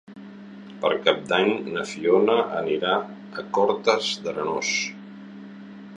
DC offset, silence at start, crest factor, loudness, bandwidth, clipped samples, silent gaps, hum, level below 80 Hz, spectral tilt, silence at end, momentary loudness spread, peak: under 0.1%; 0.1 s; 22 dB; -23 LUFS; 10.5 kHz; under 0.1%; none; none; -68 dBFS; -3.5 dB/octave; 0 s; 21 LU; -2 dBFS